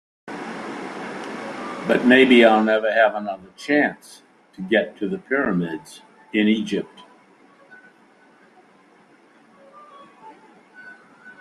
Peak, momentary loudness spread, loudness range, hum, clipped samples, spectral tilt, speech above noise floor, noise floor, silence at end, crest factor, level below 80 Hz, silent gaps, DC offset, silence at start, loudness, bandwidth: -2 dBFS; 20 LU; 10 LU; none; under 0.1%; -5.5 dB/octave; 35 dB; -54 dBFS; 0.1 s; 22 dB; -66 dBFS; none; under 0.1%; 0.25 s; -20 LUFS; 12 kHz